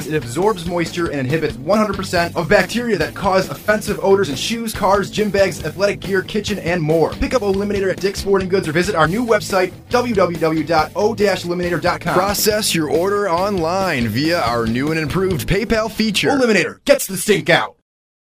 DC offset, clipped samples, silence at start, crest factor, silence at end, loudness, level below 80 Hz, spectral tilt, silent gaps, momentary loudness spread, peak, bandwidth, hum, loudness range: under 0.1%; under 0.1%; 0 s; 18 dB; 0.65 s; -17 LUFS; -38 dBFS; -4.5 dB/octave; none; 5 LU; 0 dBFS; 16 kHz; none; 1 LU